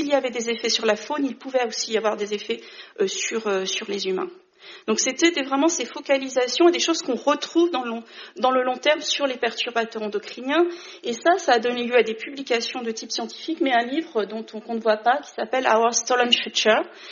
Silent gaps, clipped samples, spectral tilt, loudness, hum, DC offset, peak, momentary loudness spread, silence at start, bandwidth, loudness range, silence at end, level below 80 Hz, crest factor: none; under 0.1%; -0.5 dB/octave; -23 LUFS; none; under 0.1%; -4 dBFS; 11 LU; 0 s; 7.4 kHz; 4 LU; 0 s; -76 dBFS; 20 dB